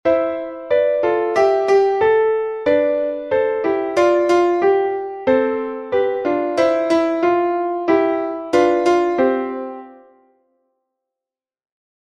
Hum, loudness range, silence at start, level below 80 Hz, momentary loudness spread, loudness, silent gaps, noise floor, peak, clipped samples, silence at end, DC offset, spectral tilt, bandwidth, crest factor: none; 4 LU; 0.05 s; -56 dBFS; 7 LU; -17 LUFS; none; -88 dBFS; -2 dBFS; under 0.1%; 2.2 s; under 0.1%; -5 dB/octave; 10 kHz; 16 dB